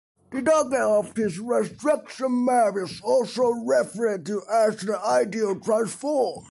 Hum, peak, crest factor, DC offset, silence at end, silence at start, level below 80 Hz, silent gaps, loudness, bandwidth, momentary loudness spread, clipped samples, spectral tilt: none; -10 dBFS; 14 dB; under 0.1%; 0.1 s; 0.3 s; -66 dBFS; none; -24 LUFS; 11.5 kHz; 6 LU; under 0.1%; -5 dB/octave